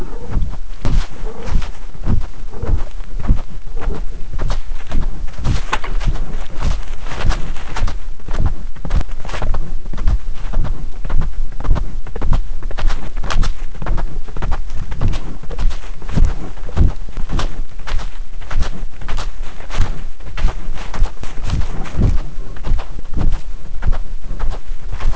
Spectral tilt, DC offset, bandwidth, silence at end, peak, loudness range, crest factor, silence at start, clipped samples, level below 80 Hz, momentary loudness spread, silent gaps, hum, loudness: -6 dB/octave; 20%; 8 kHz; 0 s; 0 dBFS; 2 LU; 12 dB; 0 s; under 0.1%; -20 dBFS; 9 LU; none; none; -25 LUFS